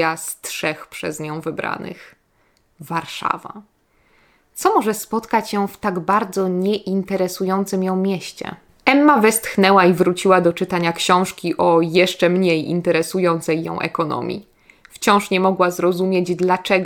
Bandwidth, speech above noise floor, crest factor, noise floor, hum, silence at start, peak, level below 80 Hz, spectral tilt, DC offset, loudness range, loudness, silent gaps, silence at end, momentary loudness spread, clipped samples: 19.5 kHz; 43 dB; 18 dB; -61 dBFS; none; 0 s; 0 dBFS; -58 dBFS; -5 dB/octave; under 0.1%; 11 LU; -18 LUFS; none; 0 s; 12 LU; under 0.1%